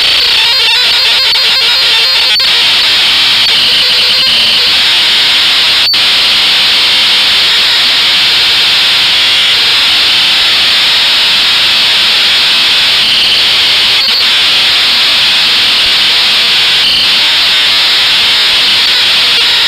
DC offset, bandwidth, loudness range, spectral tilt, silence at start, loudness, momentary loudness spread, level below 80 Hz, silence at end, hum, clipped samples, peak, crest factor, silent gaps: under 0.1%; 16 kHz; 0 LU; 0.5 dB/octave; 0 s; -4 LUFS; 0 LU; -42 dBFS; 0 s; none; under 0.1%; 0 dBFS; 8 dB; none